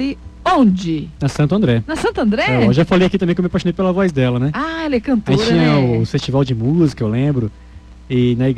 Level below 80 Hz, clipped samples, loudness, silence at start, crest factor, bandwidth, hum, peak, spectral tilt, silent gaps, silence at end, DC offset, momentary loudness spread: -38 dBFS; under 0.1%; -16 LUFS; 0 s; 12 dB; 10.5 kHz; none; -2 dBFS; -7.5 dB/octave; none; 0 s; under 0.1%; 7 LU